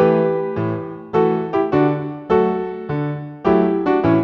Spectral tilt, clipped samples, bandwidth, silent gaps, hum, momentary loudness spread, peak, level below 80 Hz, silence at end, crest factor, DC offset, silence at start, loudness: -10 dB/octave; under 0.1%; 5.8 kHz; none; none; 8 LU; -2 dBFS; -50 dBFS; 0 s; 16 dB; under 0.1%; 0 s; -19 LUFS